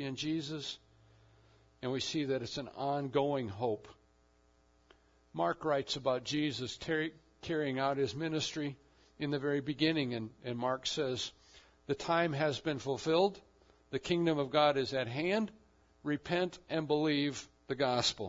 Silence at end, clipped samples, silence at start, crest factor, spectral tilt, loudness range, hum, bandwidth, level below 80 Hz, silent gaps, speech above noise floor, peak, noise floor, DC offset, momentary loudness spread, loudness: 0 s; under 0.1%; 0 s; 20 dB; -4 dB/octave; 4 LU; none; 7.4 kHz; -68 dBFS; none; 35 dB; -16 dBFS; -69 dBFS; under 0.1%; 11 LU; -35 LUFS